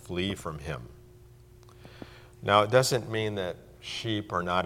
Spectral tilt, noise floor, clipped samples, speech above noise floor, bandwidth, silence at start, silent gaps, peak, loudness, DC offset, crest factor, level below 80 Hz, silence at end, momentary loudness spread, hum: -4.5 dB/octave; -53 dBFS; under 0.1%; 25 dB; 16.5 kHz; 0 s; none; -6 dBFS; -28 LUFS; under 0.1%; 24 dB; -54 dBFS; 0 s; 24 LU; none